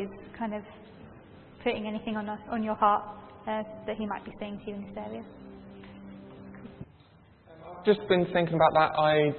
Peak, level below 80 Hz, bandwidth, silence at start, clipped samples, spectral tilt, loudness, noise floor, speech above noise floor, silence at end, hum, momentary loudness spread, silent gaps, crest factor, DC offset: -8 dBFS; -60 dBFS; 4.4 kHz; 0 s; under 0.1%; -10 dB/octave; -29 LUFS; -57 dBFS; 29 dB; 0 s; none; 24 LU; none; 22 dB; under 0.1%